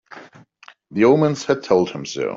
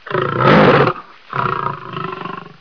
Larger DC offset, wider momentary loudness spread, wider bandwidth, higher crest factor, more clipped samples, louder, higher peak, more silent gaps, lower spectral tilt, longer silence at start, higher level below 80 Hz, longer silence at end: second, under 0.1% vs 0.4%; second, 10 LU vs 18 LU; first, 7.8 kHz vs 5.4 kHz; about the same, 16 dB vs 16 dB; neither; second, -18 LUFS vs -15 LUFS; second, -4 dBFS vs 0 dBFS; neither; second, -6 dB/octave vs -8 dB/octave; about the same, 0.15 s vs 0.05 s; second, -60 dBFS vs -46 dBFS; second, 0 s vs 0.2 s